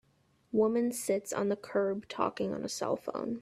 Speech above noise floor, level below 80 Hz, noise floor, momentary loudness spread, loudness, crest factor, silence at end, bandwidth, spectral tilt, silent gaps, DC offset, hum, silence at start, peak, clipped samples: 38 dB; -72 dBFS; -70 dBFS; 6 LU; -33 LUFS; 18 dB; 0 s; 15 kHz; -5 dB/octave; none; under 0.1%; none; 0.55 s; -14 dBFS; under 0.1%